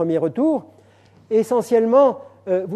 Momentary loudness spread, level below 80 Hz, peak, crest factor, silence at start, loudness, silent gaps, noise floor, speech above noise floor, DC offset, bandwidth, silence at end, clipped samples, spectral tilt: 9 LU; -72 dBFS; -2 dBFS; 16 dB; 0 s; -19 LUFS; none; -51 dBFS; 34 dB; under 0.1%; 13.5 kHz; 0 s; under 0.1%; -7.5 dB/octave